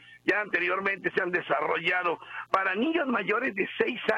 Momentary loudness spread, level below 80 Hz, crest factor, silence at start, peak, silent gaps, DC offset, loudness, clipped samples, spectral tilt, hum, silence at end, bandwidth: 3 LU; -70 dBFS; 18 dB; 0.1 s; -10 dBFS; none; under 0.1%; -27 LUFS; under 0.1%; -5.5 dB/octave; none; 0 s; 10.5 kHz